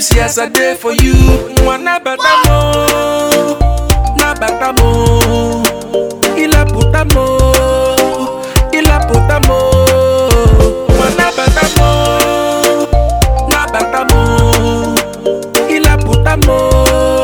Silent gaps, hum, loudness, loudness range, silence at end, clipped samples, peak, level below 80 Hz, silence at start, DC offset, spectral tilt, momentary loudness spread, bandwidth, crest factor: none; none; -10 LUFS; 2 LU; 0 s; 0.1%; 0 dBFS; -14 dBFS; 0 s; under 0.1%; -4.5 dB/octave; 5 LU; over 20 kHz; 10 dB